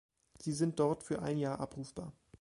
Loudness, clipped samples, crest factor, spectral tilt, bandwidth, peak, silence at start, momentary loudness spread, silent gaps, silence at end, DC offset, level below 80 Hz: -37 LUFS; under 0.1%; 18 dB; -6.5 dB/octave; 11.5 kHz; -20 dBFS; 0.4 s; 14 LU; none; 0.3 s; under 0.1%; -66 dBFS